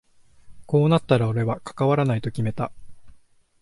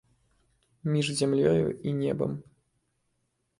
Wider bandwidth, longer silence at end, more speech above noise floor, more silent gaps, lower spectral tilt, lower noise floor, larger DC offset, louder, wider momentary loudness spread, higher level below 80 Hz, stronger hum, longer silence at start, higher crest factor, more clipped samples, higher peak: about the same, 11.5 kHz vs 11.5 kHz; second, 0.45 s vs 1.2 s; second, 32 dB vs 50 dB; neither; first, -8 dB/octave vs -6 dB/octave; second, -53 dBFS vs -77 dBFS; neither; first, -23 LUFS vs -28 LUFS; about the same, 8 LU vs 10 LU; first, -54 dBFS vs -60 dBFS; neither; second, 0.45 s vs 0.85 s; about the same, 18 dB vs 20 dB; neither; first, -6 dBFS vs -10 dBFS